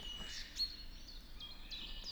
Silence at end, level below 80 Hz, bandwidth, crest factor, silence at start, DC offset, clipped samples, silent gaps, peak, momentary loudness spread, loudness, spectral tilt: 0 s; -52 dBFS; over 20 kHz; 18 dB; 0 s; under 0.1%; under 0.1%; none; -28 dBFS; 13 LU; -45 LUFS; -1.5 dB/octave